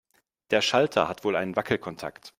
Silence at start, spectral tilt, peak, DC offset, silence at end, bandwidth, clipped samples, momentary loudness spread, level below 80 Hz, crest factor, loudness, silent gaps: 0.5 s; -4 dB/octave; -6 dBFS; under 0.1%; 0.1 s; 16 kHz; under 0.1%; 9 LU; -64 dBFS; 20 dB; -25 LUFS; none